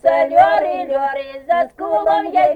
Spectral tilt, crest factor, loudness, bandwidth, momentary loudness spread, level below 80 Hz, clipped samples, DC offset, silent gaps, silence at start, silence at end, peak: -5.5 dB/octave; 14 dB; -16 LUFS; 8.4 kHz; 8 LU; -54 dBFS; under 0.1%; under 0.1%; none; 0.05 s; 0 s; -2 dBFS